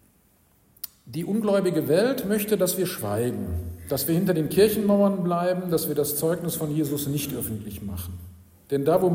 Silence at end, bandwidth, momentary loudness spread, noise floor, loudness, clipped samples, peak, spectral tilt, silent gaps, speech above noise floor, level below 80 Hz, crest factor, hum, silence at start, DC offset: 0 s; 16.5 kHz; 13 LU; -61 dBFS; -25 LUFS; under 0.1%; -8 dBFS; -5.5 dB/octave; none; 38 dB; -50 dBFS; 18 dB; none; 0.85 s; under 0.1%